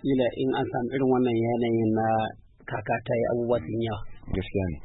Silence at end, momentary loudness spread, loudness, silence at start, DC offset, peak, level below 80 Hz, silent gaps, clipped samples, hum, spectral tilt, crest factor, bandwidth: 0 s; 10 LU; -27 LUFS; 0 s; under 0.1%; -12 dBFS; -46 dBFS; none; under 0.1%; none; -11.5 dB/octave; 14 dB; 4 kHz